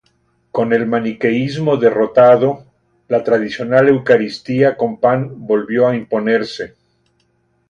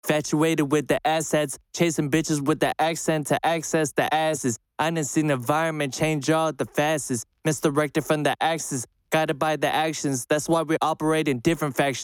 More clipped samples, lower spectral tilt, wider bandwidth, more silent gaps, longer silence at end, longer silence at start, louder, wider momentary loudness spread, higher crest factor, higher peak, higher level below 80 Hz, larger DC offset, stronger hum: neither; first, -7.5 dB/octave vs -4.5 dB/octave; second, 7.6 kHz vs 18 kHz; neither; first, 1.05 s vs 0 s; first, 0.55 s vs 0.05 s; first, -15 LUFS vs -24 LUFS; first, 9 LU vs 4 LU; about the same, 16 dB vs 16 dB; first, 0 dBFS vs -6 dBFS; about the same, -58 dBFS vs -58 dBFS; neither; neither